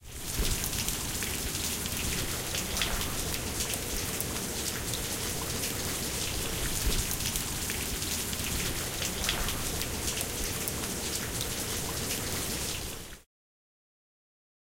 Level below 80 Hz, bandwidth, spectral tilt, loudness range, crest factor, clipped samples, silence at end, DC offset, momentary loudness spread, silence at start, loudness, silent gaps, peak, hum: -40 dBFS; 17 kHz; -2.5 dB/octave; 2 LU; 22 dB; under 0.1%; 1.55 s; under 0.1%; 3 LU; 0 s; -31 LUFS; none; -10 dBFS; none